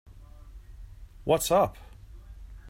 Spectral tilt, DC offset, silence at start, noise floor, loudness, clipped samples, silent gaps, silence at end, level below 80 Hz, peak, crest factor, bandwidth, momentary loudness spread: -4.5 dB/octave; under 0.1%; 0.2 s; -47 dBFS; -26 LUFS; under 0.1%; none; 0 s; -46 dBFS; -10 dBFS; 20 dB; 16 kHz; 27 LU